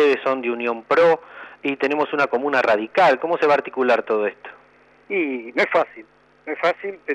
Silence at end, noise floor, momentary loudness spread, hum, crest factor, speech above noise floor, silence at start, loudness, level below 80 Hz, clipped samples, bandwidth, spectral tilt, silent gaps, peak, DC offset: 0 s; -53 dBFS; 11 LU; none; 14 dB; 33 dB; 0 s; -20 LUFS; -70 dBFS; under 0.1%; 9 kHz; -5 dB/octave; none; -6 dBFS; under 0.1%